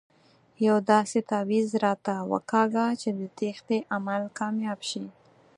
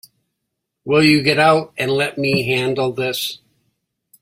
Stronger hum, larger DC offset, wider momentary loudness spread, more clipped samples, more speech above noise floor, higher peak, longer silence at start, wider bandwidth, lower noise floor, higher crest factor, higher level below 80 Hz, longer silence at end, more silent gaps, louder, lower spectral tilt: neither; neither; about the same, 10 LU vs 11 LU; neither; second, 34 dB vs 61 dB; second, -6 dBFS vs 0 dBFS; second, 0.6 s vs 0.85 s; second, 11 kHz vs 16 kHz; second, -61 dBFS vs -77 dBFS; about the same, 20 dB vs 18 dB; second, -78 dBFS vs -56 dBFS; second, 0.45 s vs 0.85 s; neither; second, -27 LUFS vs -17 LUFS; about the same, -5.5 dB/octave vs -5 dB/octave